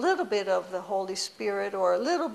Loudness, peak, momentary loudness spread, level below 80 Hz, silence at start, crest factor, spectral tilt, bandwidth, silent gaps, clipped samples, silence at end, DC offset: -28 LUFS; -14 dBFS; 5 LU; -76 dBFS; 0 s; 14 dB; -3 dB/octave; 13.5 kHz; none; under 0.1%; 0 s; under 0.1%